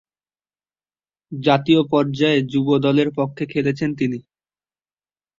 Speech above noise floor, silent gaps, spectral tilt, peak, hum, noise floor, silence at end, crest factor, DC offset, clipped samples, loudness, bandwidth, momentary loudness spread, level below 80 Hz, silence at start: over 72 dB; none; -7.5 dB/octave; -2 dBFS; 50 Hz at -50 dBFS; under -90 dBFS; 1.2 s; 18 dB; under 0.1%; under 0.1%; -19 LUFS; 7.6 kHz; 8 LU; -60 dBFS; 1.3 s